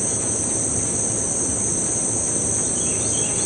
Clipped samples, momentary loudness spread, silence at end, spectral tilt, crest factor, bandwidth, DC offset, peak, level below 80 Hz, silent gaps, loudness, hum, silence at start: under 0.1%; 1 LU; 0 s; -3 dB/octave; 14 dB; 11.5 kHz; under 0.1%; -8 dBFS; -46 dBFS; none; -19 LUFS; none; 0 s